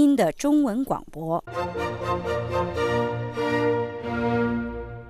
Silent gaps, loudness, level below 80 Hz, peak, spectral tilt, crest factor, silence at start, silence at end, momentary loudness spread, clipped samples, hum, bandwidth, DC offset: none; -25 LUFS; -46 dBFS; -8 dBFS; -6.5 dB/octave; 16 dB; 0 s; 0 s; 8 LU; under 0.1%; none; 15 kHz; under 0.1%